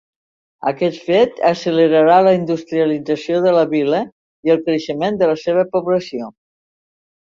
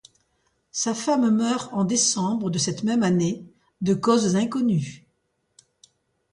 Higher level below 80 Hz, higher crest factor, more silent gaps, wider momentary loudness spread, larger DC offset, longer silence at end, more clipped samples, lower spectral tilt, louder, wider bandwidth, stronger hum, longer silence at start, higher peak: about the same, -60 dBFS vs -62 dBFS; about the same, 16 dB vs 18 dB; first, 4.12-4.43 s vs none; first, 11 LU vs 7 LU; neither; second, 1 s vs 1.35 s; neither; first, -6.5 dB/octave vs -4.5 dB/octave; first, -16 LUFS vs -23 LUFS; second, 7.4 kHz vs 11.5 kHz; neither; about the same, 0.65 s vs 0.75 s; first, -2 dBFS vs -6 dBFS